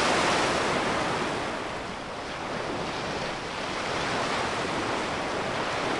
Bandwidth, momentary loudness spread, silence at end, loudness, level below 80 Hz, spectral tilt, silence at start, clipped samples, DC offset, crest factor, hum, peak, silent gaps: 11.5 kHz; 9 LU; 0 s; -28 LUFS; -52 dBFS; -3.5 dB/octave; 0 s; under 0.1%; under 0.1%; 16 dB; none; -12 dBFS; none